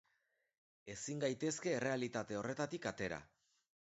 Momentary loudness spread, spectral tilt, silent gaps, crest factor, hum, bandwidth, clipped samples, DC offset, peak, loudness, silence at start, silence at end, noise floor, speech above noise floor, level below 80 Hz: 10 LU; -4.5 dB/octave; none; 20 dB; none; 8 kHz; under 0.1%; under 0.1%; -24 dBFS; -41 LUFS; 0.85 s; 0.75 s; -83 dBFS; 42 dB; -74 dBFS